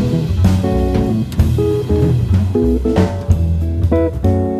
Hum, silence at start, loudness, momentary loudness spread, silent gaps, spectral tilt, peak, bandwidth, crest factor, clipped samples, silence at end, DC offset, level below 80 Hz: none; 0 s; -15 LUFS; 2 LU; none; -8.5 dB/octave; 0 dBFS; 13.5 kHz; 14 dB; under 0.1%; 0 s; under 0.1%; -22 dBFS